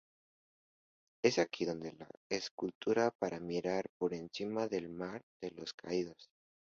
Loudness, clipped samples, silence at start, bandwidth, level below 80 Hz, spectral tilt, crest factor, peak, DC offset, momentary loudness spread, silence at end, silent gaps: -38 LUFS; under 0.1%; 1.25 s; 7.4 kHz; -74 dBFS; -4 dB/octave; 24 dB; -14 dBFS; under 0.1%; 13 LU; 0.4 s; 2.17-2.30 s, 2.51-2.58 s, 2.75-2.81 s, 3.15-3.19 s, 3.89-4.00 s, 5.23-5.40 s, 5.74-5.78 s